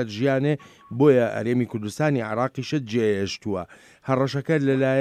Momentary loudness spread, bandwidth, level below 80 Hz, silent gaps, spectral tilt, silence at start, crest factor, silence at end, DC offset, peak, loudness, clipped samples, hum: 11 LU; 14 kHz; -64 dBFS; none; -7 dB/octave; 0 s; 18 dB; 0 s; under 0.1%; -6 dBFS; -23 LUFS; under 0.1%; none